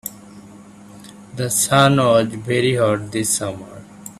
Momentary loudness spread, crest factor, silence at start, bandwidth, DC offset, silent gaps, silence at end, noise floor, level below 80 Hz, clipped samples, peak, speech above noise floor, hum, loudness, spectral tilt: 21 LU; 20 dB; 0.05 s; 15 kHz; under 0.1%; none; 0.05 s; -41 dBFS; -54 dBFS; under 0.1%; 0 dBFS; 24 dB; none; -17 LUFS; -4 dB/octave